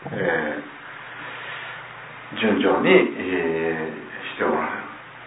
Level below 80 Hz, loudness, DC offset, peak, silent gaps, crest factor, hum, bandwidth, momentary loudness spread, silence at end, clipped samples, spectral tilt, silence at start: -62 dBFS; -23 LUFS; under 0.1%; -2 dBFS; none; 22 dB; none; 4 kHz; 19 LU; 0 s; under 0.1%; -9.5 dB/octave; 0 s